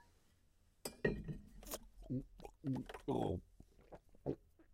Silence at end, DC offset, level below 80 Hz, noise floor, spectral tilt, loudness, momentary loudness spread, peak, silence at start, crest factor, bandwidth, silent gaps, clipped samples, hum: 0.1 s; under 0.1%; -60 dBFS; -72 dBFS; -6 dB/octave; -45 LUFS; 14 LU; -22 dBFS; 0.85 s; 24 dB; 16 kHz; none; under 0.1%; none